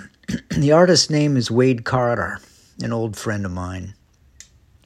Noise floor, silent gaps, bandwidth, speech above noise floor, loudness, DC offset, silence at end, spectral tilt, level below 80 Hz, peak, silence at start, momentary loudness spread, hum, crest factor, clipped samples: -49 dBFS; none; 13 kHz; 31 dB; -19 LUFS; under 0.1%; 0.95 s; -5 dB/octave; -50 dBFS; -2 dBFS; 0 s; 17 LU; none; 18 dB; under 0.1%